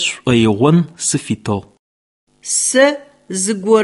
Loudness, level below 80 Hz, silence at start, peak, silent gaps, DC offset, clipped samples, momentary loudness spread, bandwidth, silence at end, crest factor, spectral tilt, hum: -15 LUFS; -48 dBFS; 0 s; 0 dBFS; 1.79-2.27 s; under 0.1%; under 0.1%; 12 LU; 12 kHz; 0 s; 16 dB; -4 dB/octave; none